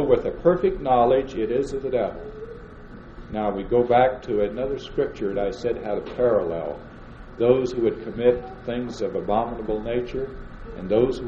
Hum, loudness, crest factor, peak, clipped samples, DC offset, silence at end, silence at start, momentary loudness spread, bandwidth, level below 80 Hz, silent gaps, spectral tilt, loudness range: none; -24 LUFS; 20 dB; -4 dBFS; under 0.1%; under 0.1%; 0 s; 0 s; 19 LU; 8.2 kHz; -42 dBFS; none; -7.5 dB/octave; 3 LU